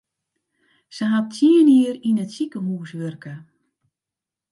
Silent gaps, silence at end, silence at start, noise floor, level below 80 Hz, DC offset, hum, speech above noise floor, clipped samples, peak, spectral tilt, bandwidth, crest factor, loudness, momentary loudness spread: none; 1.1 s; 0.95 s; -88 dBFS; -76 dBFS; under 0.1%; none; 69 dB; under 0.1%; -6 dBFS; -7 dB/octave; 11.5 kHz; 16 dB; -19 LUFS; 24 LU